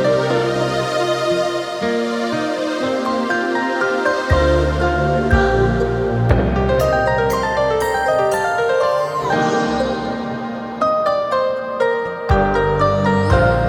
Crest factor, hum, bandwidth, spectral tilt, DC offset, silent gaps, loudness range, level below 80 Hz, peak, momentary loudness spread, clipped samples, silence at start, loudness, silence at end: 16 dB; none; 18.5 kHz; -6 dB/octave; under 0.1%; none; 3 LU; -28 dBFS; 0 dBFS; 5 LU; under 0.1%; 0 s; -18 LUFS; 0 s